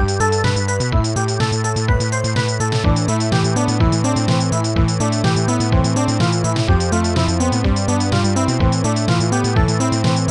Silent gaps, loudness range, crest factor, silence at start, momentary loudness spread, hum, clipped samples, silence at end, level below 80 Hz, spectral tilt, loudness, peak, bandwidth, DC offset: none; 1 LU; 14 dB; 0 s; 2 LU; none; under 0.1%; 0 s; -28 dBFS; -5.5 dB/octave; -17 LUFS; -4 dBFS; 11 kHz; 0.1%